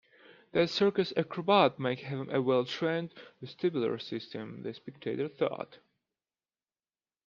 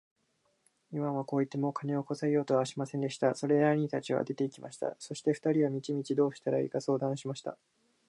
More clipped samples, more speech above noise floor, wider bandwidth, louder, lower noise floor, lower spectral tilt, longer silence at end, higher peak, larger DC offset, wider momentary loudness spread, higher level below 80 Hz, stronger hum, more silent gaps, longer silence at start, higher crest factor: neither; first, over 59 dB vs 44 dB; second, 7.4 kHz vs 11.5 kHz; about the same, -31 LUFS vs -32 LUFS; first, under -90 dBFS vs -75 dBFS; about the same, -6.5 dB/octave vs -6.5 dB/octave; first, 1.5 s vs 0.55 s; first, -10 dBFS vs -14 dBFS; neither; first, 16 LU vs 9 LU; first, -76 dBFS vs -82 dBFS; neither; neither; second, 0.55 s vs 0.9 s; about the same, 22 dB vs 18 dB